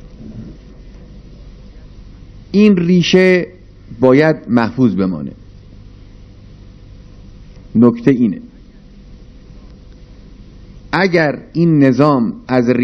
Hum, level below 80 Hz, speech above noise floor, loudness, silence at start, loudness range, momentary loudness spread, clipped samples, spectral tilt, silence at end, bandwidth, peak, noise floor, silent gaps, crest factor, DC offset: 50 Hz at -40 dBFS; -40 dBFS; 27 dB; -13 LUFS; 0.05 s; 8 LU; 19 LU; 0.2%; -7 dB/octave; 0 s; 6.4 kHz; 0 dBFS; -39 dBFS; none; 16 dB; under 0.1%